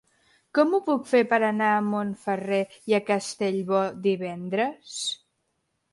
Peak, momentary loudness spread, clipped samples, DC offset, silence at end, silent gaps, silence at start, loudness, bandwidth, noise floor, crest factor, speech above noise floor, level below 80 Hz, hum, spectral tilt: -6 dBFS; 8 LU; under 0.1%; under 0.1%; 0.8 s; none; 0.55 s; -25 LUFS; 11.5 kHz; -76 dBFS; 18 dB; 51 dB; -72 dBFS; none; -5 dB/octave